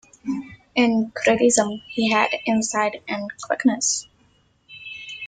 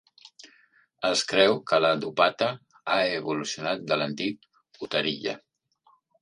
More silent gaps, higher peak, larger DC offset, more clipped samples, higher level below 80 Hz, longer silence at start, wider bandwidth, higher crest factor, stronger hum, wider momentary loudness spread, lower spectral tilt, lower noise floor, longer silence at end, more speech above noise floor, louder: neither; about the same, -4 dBFS vs -4 dBFS; neither; neither; first, -62 dBFS vs -70 dBFS; second, 0.25 s vs 0.45 s; second, 9.6 kHz vs 11.5 kHz; second, 18 dB vs 24 dB; neither; about the same, 13 LU vs 12 LU; about the same, -3 dB/octave vs -3.5 dB/octave; second, -60 dBFS vs -65 dBFS; second, 0 s vs 0.85 s; about the same, 40 dB vs 39 dB; first, -21 LUFS vs -26 LUFS